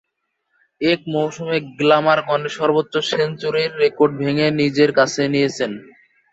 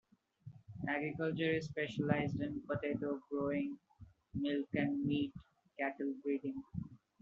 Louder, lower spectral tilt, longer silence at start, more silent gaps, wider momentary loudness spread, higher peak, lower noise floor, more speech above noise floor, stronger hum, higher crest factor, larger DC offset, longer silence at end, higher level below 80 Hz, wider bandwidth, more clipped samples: first, -18 LUFS vs -39 LUFS; about the same, -5 dB/octave vs -5.5 dB/octave; first, 0.8 s vs 0.45 s; neither; second, 7 LU vs 18 LU; first, -2 dBFS vs -16 dBFS; first, -73 dBFS vs -58 dBFS; first, 55 dB vs 20 dB; neither; second, 16 dB vs 24 dB; neither; first, 0.5 s vs 0.25 s; first, -62 dBFS vs -68 dBFS; about the same, 8 kHz vs 7.4 kHz; neither